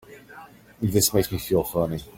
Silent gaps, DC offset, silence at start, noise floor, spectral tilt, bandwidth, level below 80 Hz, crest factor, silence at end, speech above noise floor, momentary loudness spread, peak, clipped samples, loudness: none; under 0.1%; 0.1 s; -46 dBFS; -4.5 dB/octave; 17 kHz; -48 dBFS; 18 dB; 0.05 s; 23 dB; 9 LU; -6 dBFS; under 0.1%; -23 LUFS